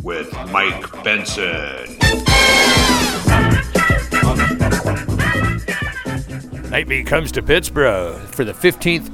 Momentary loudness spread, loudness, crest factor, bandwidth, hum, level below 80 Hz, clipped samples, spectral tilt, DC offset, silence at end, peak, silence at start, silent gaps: 13 LU; -16 LUFS; 16 dB; 18 kHz; none; -26 dBFS; under 0.1%; -4 dB/octave; under 0.1%; 0 s; 0 dBFS; 0 s; none